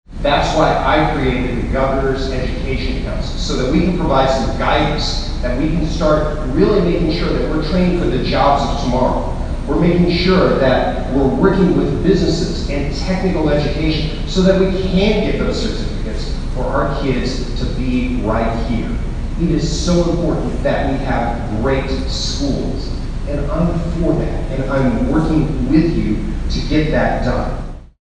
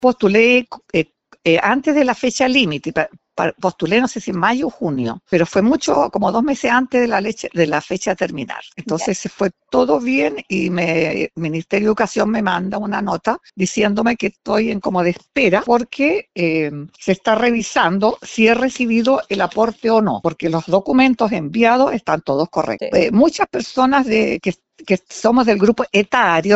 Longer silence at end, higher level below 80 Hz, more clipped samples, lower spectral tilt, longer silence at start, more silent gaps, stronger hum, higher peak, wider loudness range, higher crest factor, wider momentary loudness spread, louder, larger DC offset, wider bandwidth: first, 0.2 s vs 0 s; first, -22 dBFS vs -50 dBFS; neither; first, -6.5 dB/octave vs -5 dB/octave; about the same, 0.1 s vs 0 s; neither; neither; about the same, 0 dBFS vs 0 dBFS; about the same, 4 LU vs 3 LU; about the same, 16 dB vs 16 dB; about the same, 8 LU vs 8 LU; about the same, -17 LUFS vs -17 LUFS; neither; first, 9.6 kHz vs 8.2 kHz